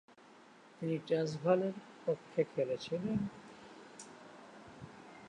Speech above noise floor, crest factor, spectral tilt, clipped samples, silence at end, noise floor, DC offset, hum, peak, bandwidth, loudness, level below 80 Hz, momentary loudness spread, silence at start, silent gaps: 25 dB; 22 dB; -7 dB/octave; under 0.1%; 0 s; -60 dBFS; under 0.1%; none; -18 dBFS; 10.5 kHz; -37 LUFS; -72 dBFS; 22 LU; 0.8 s; none